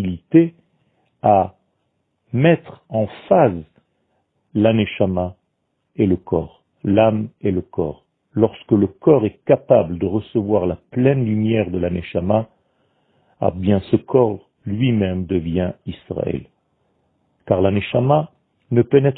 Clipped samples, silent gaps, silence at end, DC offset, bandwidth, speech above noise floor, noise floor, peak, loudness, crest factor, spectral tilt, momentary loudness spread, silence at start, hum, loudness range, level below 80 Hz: under 0.1%; none; 0 s; under 0.1%; 4.1 kHz; 54 dB; -71 dBFS; 0 dBFS; -19 LUFS; 18 dB; -12.5 dB/octave; 11 LU; 0 s; none; 4 LU; -48 dBFS